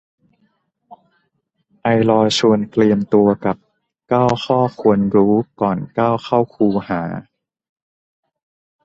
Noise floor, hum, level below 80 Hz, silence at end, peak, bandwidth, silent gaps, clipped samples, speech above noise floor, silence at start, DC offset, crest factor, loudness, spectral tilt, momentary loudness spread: -69 dBFS; none; -52 dBFS; 1.65 s; -2 dBFS; 8.2 kHz; none; under 0.1%; 53 dB; 0.9 s; under 0.1%; 16 dB; -17 LUFS; -6.5 dB/octave; 9 LU